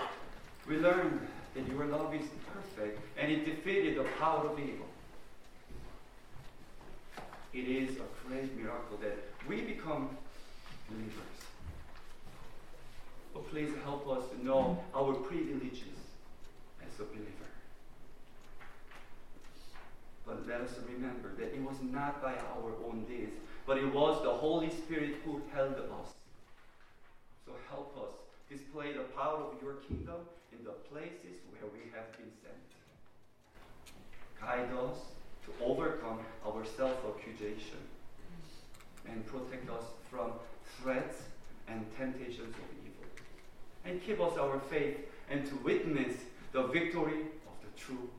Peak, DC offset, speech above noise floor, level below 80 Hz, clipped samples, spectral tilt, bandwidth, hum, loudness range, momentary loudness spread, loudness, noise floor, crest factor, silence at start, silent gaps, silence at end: -16 dBFS; under 0.1%; 22 dB; -54 dBFS; under 0.1%; -6 dB/octave; 15.5 kHz; none; 13 LU; 23 LU; -38 LUFS; -60 dBFS; 22 dB; 0 s; none; 0 s